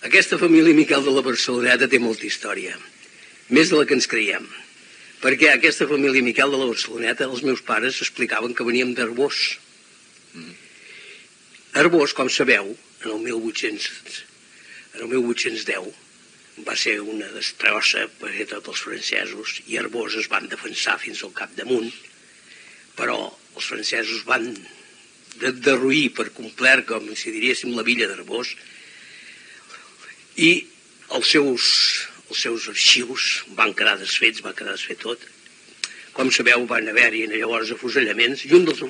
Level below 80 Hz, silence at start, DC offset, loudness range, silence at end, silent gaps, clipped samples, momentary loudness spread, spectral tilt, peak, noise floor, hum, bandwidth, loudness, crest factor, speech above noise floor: -80 dBFS; 0 s; under 0.1%; 8 LU; 0 s; none; under 0.1%; 16 LU; -2.5 dB/octave; 0 dBFS; -50 dBFS; none; 10 kHz; -19 LUFS; 22 dB; 30 dB